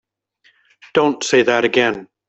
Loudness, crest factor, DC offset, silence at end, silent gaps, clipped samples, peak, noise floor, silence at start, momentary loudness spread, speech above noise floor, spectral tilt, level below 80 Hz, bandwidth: -16 LUFS; 16 dB; under 0.1%; 0.25 s; none; under 0.1%; -2 dBFS; -59 dBFS; 0.95 s; 5 LU; 43 dB; -3.5 dB/octave; -60 dBFS; 8.2 kHz